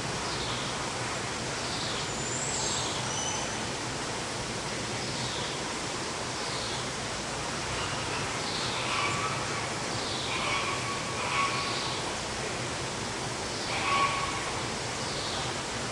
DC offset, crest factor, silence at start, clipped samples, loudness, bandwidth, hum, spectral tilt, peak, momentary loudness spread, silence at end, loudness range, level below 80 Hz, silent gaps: under 0.1%; 18 dB; 0 s; under 0.1%; -31 LUFS; 11.5 kHz; none; -2.5 dB/octave; -16 dBFS; 5 LU; 0 s; 2 LU; -52 dBFS; none